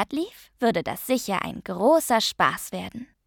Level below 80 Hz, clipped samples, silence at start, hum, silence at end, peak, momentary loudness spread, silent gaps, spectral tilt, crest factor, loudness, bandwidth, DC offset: -58 dBFS; under 0.1%; 0 s; none; 0.2 s; -6 dBFS; 13 LU; none; -3.5 dB/octave; 20 dB; -24 LUFS; 19 kHz; under 0.1%